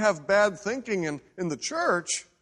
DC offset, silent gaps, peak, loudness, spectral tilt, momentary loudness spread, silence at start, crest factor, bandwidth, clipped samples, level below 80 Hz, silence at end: under 0.1%; none; -8 dBFS; -27 LUFS; -3.5 dB/octave; 10 LU; 0 s; 18 dB; 11 kHz; under 0.1%; -66 dBFS; 0.2 s